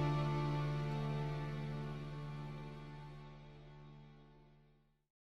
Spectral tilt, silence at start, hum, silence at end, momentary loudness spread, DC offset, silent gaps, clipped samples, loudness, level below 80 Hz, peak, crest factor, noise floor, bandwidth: -8 dB/octave; 0 s; none; 0.6 s; 20 LU; under 0.1%; none; under 0.1%; -42 LUFS; -56 dBFS; -28 dBFS; 16 dB; -71 dBFS; 7.2 kHz